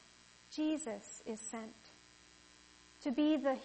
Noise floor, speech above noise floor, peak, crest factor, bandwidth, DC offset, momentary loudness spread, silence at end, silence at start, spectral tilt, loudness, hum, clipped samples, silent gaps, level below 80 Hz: -63 dBFS; 26 dB; -22 dBFS; 18 dB; 8.4 kHz; under 0.1%; 27 LU; 0 s; 0.5 s; -3.5 dB/octave; -39 LUFS; 60 Hz at -75 dBFS; under 0.1%; none; -76 dBFS